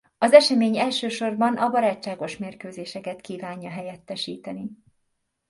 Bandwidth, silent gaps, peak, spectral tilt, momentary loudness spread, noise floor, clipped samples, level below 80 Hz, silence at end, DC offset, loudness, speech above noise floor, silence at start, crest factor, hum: 11.5 kHz; none; 0 dBFS; -4.5 dB/octave; 20 LU; -75 dBFS; under 0.1%; -70 dBFS; 0.75 s; under 0.1%; -21 LUFS; 52 dB; 0.2 s; 24 dB; none